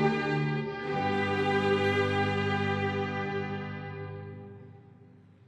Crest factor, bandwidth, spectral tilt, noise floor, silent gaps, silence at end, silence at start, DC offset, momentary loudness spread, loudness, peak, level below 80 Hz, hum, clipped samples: 16 dB; 9.6 kHz; -7 dB/octave; -55 dBFS; none; 0.45 s; 0 s; under 0.1%; 16 LU; -30 LUFS; -14 dBFS; -64 dBFS; none; under 0.1%